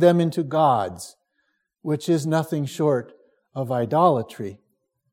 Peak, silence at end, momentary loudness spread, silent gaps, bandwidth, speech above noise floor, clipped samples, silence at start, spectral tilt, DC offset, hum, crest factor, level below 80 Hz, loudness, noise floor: -4 dBFS; 0.6 s; 16 LU; none; 16.5 kHz; 51 dB; under 0.1%; 0 s; -7 dB/octave; under 0.1%; none; 20 dB; -70 dBFS; -22 LUFS; -72 dBFS